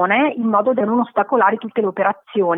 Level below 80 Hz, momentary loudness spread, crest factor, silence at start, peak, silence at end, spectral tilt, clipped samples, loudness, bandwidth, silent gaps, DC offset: -74 dBFS; 5 LU; 14 dB; 0 s; -2 dBFS; 0 s; -9.5 dB/octave; under 0.1%; -18 LUFS; 3.8 kHz; none; under 0.1%